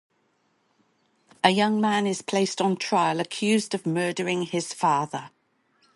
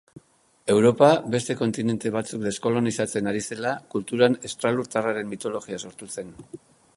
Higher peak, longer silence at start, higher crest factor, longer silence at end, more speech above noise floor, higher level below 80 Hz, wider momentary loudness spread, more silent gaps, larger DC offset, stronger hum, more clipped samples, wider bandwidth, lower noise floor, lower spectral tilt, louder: about the same, -4 dBFS vs -2 dBFS; first, 1.45 s vs 0.15 s; about the same, 22 dB vs 22 dB; first, 0.7 s vs 0.4 s; first, 45 dB vs 30 dB; second, -74 dBFS vs -62 dBFS; second, 5 LU vs 17 LU; neither; neither; neither; neither; about the same, 11.5 kHz vs 11.5 kHz; first, -69 dBFS vs -54 dBFS; about the same, -4.5 dB/octave vs -5 dB/octave; about the same, -24 LUFS vs -24 LUFS